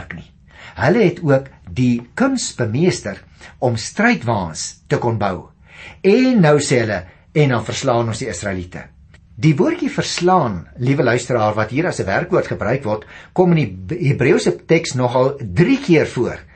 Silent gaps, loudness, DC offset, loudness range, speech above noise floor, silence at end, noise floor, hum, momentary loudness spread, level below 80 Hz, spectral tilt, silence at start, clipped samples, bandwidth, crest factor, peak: none; -17 LUFS; under 0.1%; 3 LU; 25 dB; 0.15 s; -41 dBFS; none; 10 LU; -46 dBFS; -6 dB/octave; 0 s; under 0.1%; 8.8 kHz; 16 dB; -2 dBFS